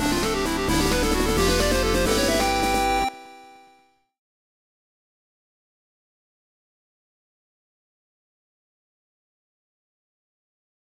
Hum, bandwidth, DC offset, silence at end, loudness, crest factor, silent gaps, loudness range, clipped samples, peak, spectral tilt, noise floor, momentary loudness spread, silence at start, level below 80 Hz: none; 16 kHz; under 0.1%; 7.5 s; -22 LUFS; 18 dB; none; 9 LU; under 0.1%; -8 dBFS; -3.5 dB/octave; -60 dBFS; 3 LU; 0 s; -36 dBFS